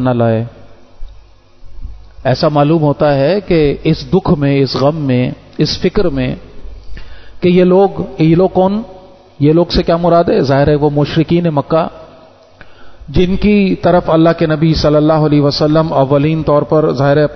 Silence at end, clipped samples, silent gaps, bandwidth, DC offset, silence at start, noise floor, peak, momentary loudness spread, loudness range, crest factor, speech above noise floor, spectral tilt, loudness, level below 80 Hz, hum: 0 s; under 0.1%; none; 6.4 kHz; under 0.1%; 0 s; -41 dBFS; 0 dBFS; 6 LU; 4 LU; 12 dB; 30 dB; -8 dB/octave; -12 LUFS; -32 dBFS; none